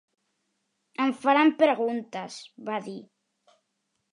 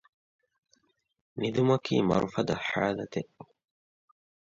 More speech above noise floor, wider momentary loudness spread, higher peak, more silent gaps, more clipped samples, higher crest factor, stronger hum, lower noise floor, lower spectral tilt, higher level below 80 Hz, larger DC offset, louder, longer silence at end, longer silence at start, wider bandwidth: first, 53 dB vs 43 dB; first, 20 LU vs 12 LU; first, -8 dBFS vs -12 dBFS; neither; neither; about the same, 20 dB vs 20 dB; neither; first, -78 dBFS vs -71 dBFS; second, -5 dB/octave vs -6.5 dB/octave; second, -84 dBFS vs -60 dBFS; neither; first, -25 LUFS vs -29 LUFS; about the same, 1.1 s vs 1.1 s; second, 1 s vs 1.35 s; first, 11 kHz vs 7.6 kHz